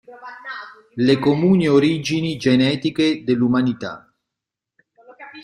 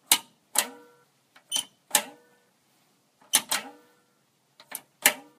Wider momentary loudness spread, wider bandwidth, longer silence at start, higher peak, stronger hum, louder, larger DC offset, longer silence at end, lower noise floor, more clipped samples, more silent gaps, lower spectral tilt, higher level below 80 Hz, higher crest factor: about the same, 19 LU vs 17 LU; second, 10.5 kHz vs 15.5 kHz; about the same, 0.1 s vs 0.1 s; about the same, -2 dBFS vs 0 dBFS; neither; first, -18 LUFS vs -26 LUFS; neither; second, 0 s vs 0.2 s; first, -85 dBFS vs -68 dBFS; neither; neither; first, -6.5 dB/octave vs 1.5 dB/octave; first, -56 dBFS vs -82 dBFS; second, 16 dB vs 32 dB